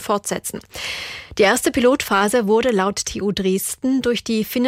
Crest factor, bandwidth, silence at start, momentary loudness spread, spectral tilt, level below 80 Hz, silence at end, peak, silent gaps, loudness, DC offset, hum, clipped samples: 14 dB; 16 kHz; 0 s; 11 LU; -3.5 dB/octave; -48 dBFS; 0 s; -4 dBFS; none; -19 LUFS; under 0.1%; none; under 0.1%